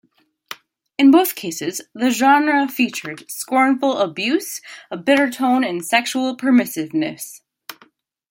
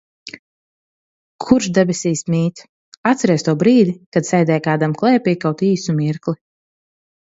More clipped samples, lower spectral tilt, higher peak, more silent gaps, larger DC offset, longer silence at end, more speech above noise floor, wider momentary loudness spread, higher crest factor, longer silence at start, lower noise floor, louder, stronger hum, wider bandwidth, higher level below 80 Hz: neither; second, -3.5 dB/octave vs -6 dB/octave; about the same, 0 dBFS vs 0 dBFS; second, none vs 0.39-1.39 s, 2.69-3.04 s, 4.06-4.12 s; neither; second, 0.6 s vs 1 s; second, 37 dB vs over 74 dB; first, 21 LU vs 11 LU; about the same, 18 dB vs 18 dB; first, 0.5 s vs 0.25 s; second, -55 dBFS vs under -90 dBFS; about the same, -18 LUFS vs -17 LUFS; neither; first, 17 kHz vs 8 kHz; second, -70 dBFS vs -58 dBFS